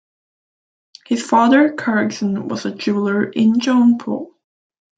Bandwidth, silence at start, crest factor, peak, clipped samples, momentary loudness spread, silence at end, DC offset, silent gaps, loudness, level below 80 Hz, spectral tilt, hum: 9 kHz; 1.1 s; 16 dB; -2 dBFS; under 0.1%; 11 LU; 0.7 s; under 0.1%; none; -17 LUFS; -66 dBFS; -5.5 dB/octave; none